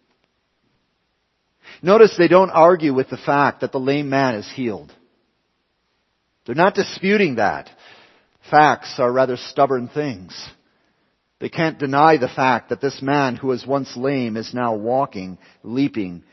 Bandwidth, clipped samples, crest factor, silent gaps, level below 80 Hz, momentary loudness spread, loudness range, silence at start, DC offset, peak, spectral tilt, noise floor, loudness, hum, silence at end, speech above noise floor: 6.2 kHz; under 0.1%; 20 dB; none; -62 dBFS; 15 LU; 7 LU; 1.7 s; under 0.1%; 0 dBFS; -6.5 dB/octave; -69 dBFS; -18 LUFS; none; 0.15 s; 51 dB